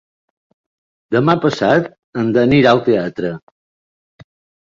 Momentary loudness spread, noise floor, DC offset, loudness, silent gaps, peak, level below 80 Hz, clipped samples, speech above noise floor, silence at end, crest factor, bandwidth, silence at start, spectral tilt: 13 LU; under -90 dBFS; under 0.1%; -15 LUFS; 1.99-2.13 s; -2 dBFS; -52 dBFS; under 0.1%; over 76 dB; 1.3 s; 16 dB; 7.6 kHz; 1.1 s; -7 dB/octave